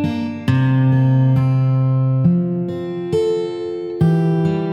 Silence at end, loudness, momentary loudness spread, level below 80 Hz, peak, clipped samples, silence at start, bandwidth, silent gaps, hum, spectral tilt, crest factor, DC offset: 0 s; -17 LUFS; 9 LU; -50 dBFS; -4 dBFS; under 0.1%; 0 s; 6.8 kHz; none; none; -9.5 dB/octave; 12 dB; under 0.1%